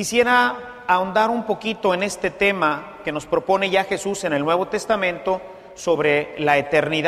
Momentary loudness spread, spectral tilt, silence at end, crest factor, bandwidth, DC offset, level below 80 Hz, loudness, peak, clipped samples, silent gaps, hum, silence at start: 9 LU; -4 dB/octave; 0 s; 18 dB; 15 kHz; under 0.1%; -54 dBFS; -20 LUFS; -4 dBFS; under 0.1%; none; none; 0 s